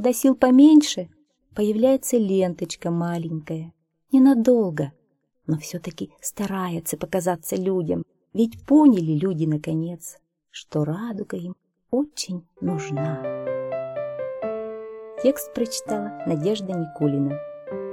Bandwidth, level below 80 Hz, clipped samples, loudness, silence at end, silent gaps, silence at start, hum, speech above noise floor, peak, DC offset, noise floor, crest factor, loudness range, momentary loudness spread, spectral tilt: 17 kHz; -60 dBFS; under 0.1%; -23 LUFS; 0 s; none; 0 s; none; 47 dB; -4 dBFS; under 0.1%; -68 dBFS; 18 dB; 7 LU; 17 LU; -6 dB/octave